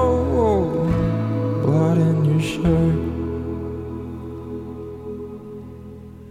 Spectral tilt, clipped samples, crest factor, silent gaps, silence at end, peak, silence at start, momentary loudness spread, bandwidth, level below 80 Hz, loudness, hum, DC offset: -8.5 dB/octave; under 0.1%; 16 dB; none; 0 s; -6 dBFS; 0 s; 18 LU; 10.5 kHz; -36 dBFS; -21 LUFS; none; under 0.1%